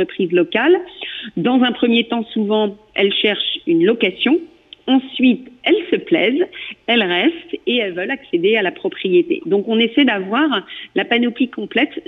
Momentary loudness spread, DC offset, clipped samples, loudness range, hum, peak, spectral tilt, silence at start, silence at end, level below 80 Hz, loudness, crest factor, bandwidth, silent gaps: 7 LU; under 0.1%; under 0.1%; 1 LU; none; -4 dBFS; -7.5 dB/octave; 0 s; 0.05 s; -62 dBFS; -17 LUFS; 14 dB; 4.1 kHz; none